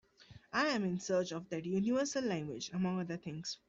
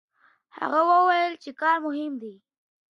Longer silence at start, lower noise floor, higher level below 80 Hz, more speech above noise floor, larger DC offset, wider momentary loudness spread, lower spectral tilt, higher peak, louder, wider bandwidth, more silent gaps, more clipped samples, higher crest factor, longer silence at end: second, 0.2 s vs 0.55 s; about the same, -60 dBFS vs -57 dBFS; first, -72 dBFS vs -86 dBFS; second, 24 dB vs 34 dB; neither; second, 8 LU vs 15 LU; about the same, -5 dB/octave vs -4.5 dB/octave; second, -20 dBFS vs -8 dBFS; second, -36 LUFS vs -23 LUFS; about the same, 8 kHz vs 7.4 kHz; neither; neither; about the same, 16 dB vs 16 dB; second, 0.15 s vs 0.65 s